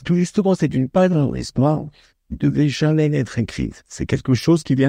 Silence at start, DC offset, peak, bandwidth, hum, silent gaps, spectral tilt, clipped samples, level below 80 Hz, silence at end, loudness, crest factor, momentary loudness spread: 0 s; under 0.1%; -4 dBFS; 10.5 kHz; none; none; -7 dB/octave; under 0.1%; -42 dBFS; 0 s; -19 LUFS; 14 dB; 10 LU